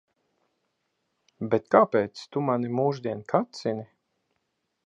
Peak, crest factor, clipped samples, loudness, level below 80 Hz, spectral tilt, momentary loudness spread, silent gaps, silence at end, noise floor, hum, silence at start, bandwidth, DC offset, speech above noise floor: -2 dBFS; 26 dB; under 0.1%; -26 LUFS; -70 dBFS; -7 dB/octave; 12 LU; none; 1 s; -78 dBFS; none; 1.4 s; 8.2 kHz; under 0.1%; 53 dB